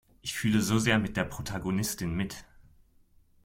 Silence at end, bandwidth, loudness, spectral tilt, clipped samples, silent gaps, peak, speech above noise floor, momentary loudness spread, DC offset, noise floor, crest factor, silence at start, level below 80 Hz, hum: 1 s; 16.5 kHz; -29 LUFS; -4.5 dB/octave; under 0.1%; none; -10 dBFS; 33 dB; 11 LU; under 0.1%; -62 dBFS; 20 dB; 0.25 s; -52 dBFS; none